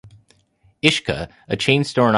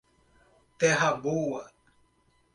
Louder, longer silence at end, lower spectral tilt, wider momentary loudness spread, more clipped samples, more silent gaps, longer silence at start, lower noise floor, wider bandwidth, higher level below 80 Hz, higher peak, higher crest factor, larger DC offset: first, -19 LUFS vs -27 LUFS; second, 0 s vs 0.9 s; about the same, -5 dB/octave vs -4 dB/octave; about the same, 10 LU vs 10 LU; neither; neither; second, 0.05 s vs 0.8 s; second, -59 dBFS vs -68 dBFS; about the same, 11.5 kHz vs 11.5 kHz; first, -48 dBFS vs -66 dBFS; first, 0 dBFS vs -12 dBFS; about the same, 20 dB vs 20 dB; neither